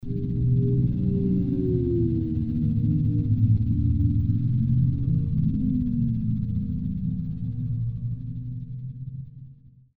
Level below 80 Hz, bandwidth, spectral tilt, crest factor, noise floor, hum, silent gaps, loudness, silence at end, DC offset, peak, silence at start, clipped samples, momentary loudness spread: -36 dBFS; 1.2 kHz; -13.5 dB/octave; 14 dB; -49 dBFS; none; none; -25 LUFS; 0.45 s; under 0.1%; -10 dBFS; 0 s; under 0.1%; 12 LU